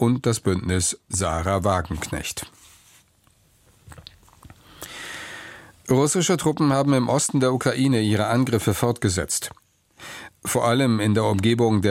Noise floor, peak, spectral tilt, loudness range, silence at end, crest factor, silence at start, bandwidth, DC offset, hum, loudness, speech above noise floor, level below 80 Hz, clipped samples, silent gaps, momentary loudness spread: -60 dBFS; -6 dBFS; -5 dB/octave; 15 LU; 0 s; 18 dB; 0 s; 16.5 kHz; under 0.1%; none; -22 LUFS; 39 dB; -46 dBFS; under 0.1%; none; 18 LU